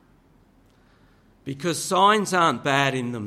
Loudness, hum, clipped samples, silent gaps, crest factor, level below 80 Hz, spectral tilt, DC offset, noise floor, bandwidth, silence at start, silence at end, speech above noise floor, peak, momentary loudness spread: -21 LUFS; none; under 0.1%; none; 20 dB; -62 dBFS; -4 dB/octave; under 0.1%; -57 dBFS; 15 kHz; 1.45 s; 0 s; 36 dB; -4 dBFS; 14 LU